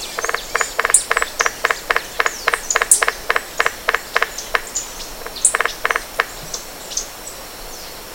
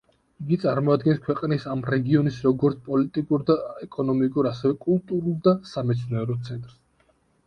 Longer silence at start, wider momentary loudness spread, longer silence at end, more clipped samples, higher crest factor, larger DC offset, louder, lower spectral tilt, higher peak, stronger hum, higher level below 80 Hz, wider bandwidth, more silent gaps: second, 0 s vs 0.4 s; first, 16 LU vs 7 LU; second, 0 s vs 0.75 s; first, 0.1% vs under 0.1%; about the same, 20 dB vs 16 dB; neither; first, -18 LUFS vs -24 LUFS; second, 1 dB/octave vs -9 dB/octave; first, 0 dBFS vs -8 dBFS; neither; first, -42 dBFS vs -58 dBFS; first, over 20 kHz vs 8.6 kHz; neither